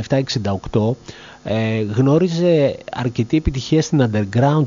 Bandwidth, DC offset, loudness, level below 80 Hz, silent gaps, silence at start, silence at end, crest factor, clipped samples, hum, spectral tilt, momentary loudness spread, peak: 7.4 kHz; under 0.1%; -18 LUFS; -36 dBFS; none; 0 s; 0 s; 14 dB; under 0.1%; none; -6.5 dB/octave; 8 LU; -2 dBFS